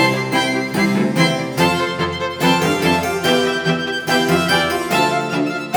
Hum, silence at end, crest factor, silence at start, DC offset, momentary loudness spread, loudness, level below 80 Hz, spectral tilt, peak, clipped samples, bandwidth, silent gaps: none; 0 s; 16 dB; 0 s; under 0.1%; 4 LU; -17 LUFS; -48 dBFS; -4.5 dB/octave; -2 dBFS; under 0.1%; over 20 kHz; none